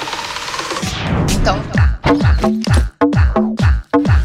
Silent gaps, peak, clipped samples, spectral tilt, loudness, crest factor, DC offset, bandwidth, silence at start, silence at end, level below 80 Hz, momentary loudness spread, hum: none; -2 dBFS; under 0.1%; -6 dB/octave; -16 LUFS; 12 dB; under 0.1%; 14 kHz; 0 s; 0 s; -20 dBFS; 7 LU; none